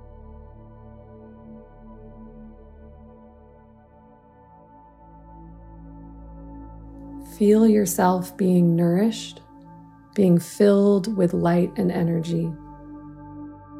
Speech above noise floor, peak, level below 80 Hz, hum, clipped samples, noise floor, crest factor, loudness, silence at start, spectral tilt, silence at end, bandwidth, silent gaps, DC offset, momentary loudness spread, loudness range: 32 dB; -6 dBFS; -50 dBFS; none; under 0.1%; -51 dBFS; 18 dB; -20 LUFS; 0.3 s; -7 dB/octave; 0 s; 15.5 kHz; none; under 0.1%; 26 LU; 4 LU